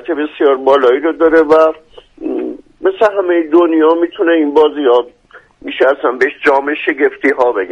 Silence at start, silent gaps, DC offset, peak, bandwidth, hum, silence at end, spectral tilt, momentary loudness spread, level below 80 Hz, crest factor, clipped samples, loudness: 0.05 s; none; under 0.1%; 0 dBFS; 7.4 kHz; none; 0 s; -5 dB/octave; 12 LU; -52 dBFS; 12 dB; under 0.1%; -12 LUFS